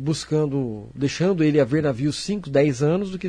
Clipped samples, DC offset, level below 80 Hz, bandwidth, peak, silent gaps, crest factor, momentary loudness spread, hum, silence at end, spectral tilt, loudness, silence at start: under 0.1%; under 0.1%; -52 dBFS; 10.5 kHz; -8 dBFS; none; 14 dB; 8 LU; none; 0 s; -6.5 dB/octave; -22 LUFS; 0 s